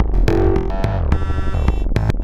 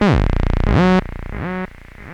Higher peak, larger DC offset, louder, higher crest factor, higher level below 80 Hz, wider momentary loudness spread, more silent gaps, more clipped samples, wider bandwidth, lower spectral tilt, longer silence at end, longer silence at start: about the same, -2 dBFS vs -4 dBFS; neither; about the same, -19 LUFS vs -18 LUFS; about the same, 12 dB vs 14 dB; about the same, -18 dBFS vs -22 dBFS; second, 4 LU vs 16 LU; neither; neither; about the same, 8 kHz vs 8.6 kHz; about the same, -8 dB/octave vs -8 dB/octave; about the same, 0 s vs 0 s; about the same, 0 s vs 0 s